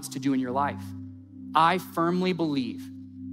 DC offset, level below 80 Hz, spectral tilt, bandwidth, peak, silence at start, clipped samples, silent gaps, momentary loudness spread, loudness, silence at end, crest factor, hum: under 0.1%; -72 dBFS; -5.5 dB/octave; 16 kHz; -6 dBFS; 0 s; under 0.1%; none; 19 LU; -26 LUFS; 0 s; 20 dB; none